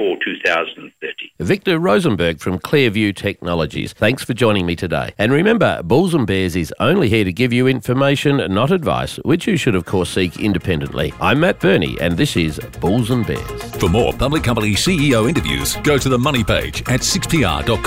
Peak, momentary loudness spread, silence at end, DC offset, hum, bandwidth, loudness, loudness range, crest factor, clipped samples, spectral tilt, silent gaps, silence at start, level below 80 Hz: -2 dBFS; 6 LU; 0 s; 0.3%; none; 16 kHz; -17 LUFS; 2 LU; 14 dB; under 0.1%; -5 dB/octave; none; 0 s; -34 dBFS